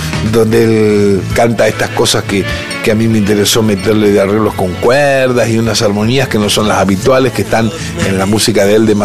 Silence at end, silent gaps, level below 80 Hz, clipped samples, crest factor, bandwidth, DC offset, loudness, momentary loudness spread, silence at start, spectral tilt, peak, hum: 0 s; none; -34 dBFS; under 0.1%; 10 dB; 15.5 kHz; 1%; -10 LUFS; 4 LU; 0 s; -5 dB/octave; 0 dBFS; none